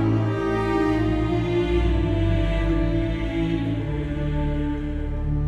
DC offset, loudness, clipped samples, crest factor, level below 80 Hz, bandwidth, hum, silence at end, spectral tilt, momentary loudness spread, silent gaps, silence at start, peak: under 0.1%; -24 LUFS; under 0.1%; 12 dB; -28 dBFS; 8.4 kHz; none; 0 s; -8.5 dB/octave; 5 LU; none; 0 s; -10 dBFS